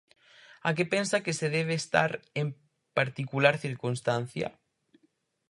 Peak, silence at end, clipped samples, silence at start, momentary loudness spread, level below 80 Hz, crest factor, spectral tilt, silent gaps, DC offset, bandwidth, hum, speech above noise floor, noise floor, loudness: -4 dBFS; 1 s; under 0.1%; 0.65 s; 9 LU; -70 dBFS; 26 dB; -5 dB/octave; none; under 0.1%; 11.5 kHz; none; 43 dB; -72 dBFS; -29 LUFS